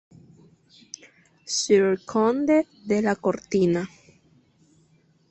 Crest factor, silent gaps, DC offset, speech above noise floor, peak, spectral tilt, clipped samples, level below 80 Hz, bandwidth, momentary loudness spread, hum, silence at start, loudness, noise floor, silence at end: 18 dB; none; under 0.1%; 39 dB; -8 dBFS; -5 dB/octave; under 0.1%; -64 dBFS; 8.4 kHz; 22 LU; none; 1.45 s; -23 LUFS; -61 dBFS; 1.45 s